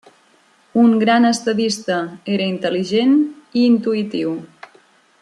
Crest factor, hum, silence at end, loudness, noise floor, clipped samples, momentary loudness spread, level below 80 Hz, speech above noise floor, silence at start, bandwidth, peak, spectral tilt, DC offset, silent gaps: 16 dB; none; 0.75 s; -17 LUFS; -55 dBFS; under 0.1%; 9 LU; -68 dBFS; 38 dB; 0.75 s; 11.5 kHz; -2 dBFS; -5 dB/octave; under 0.1%; none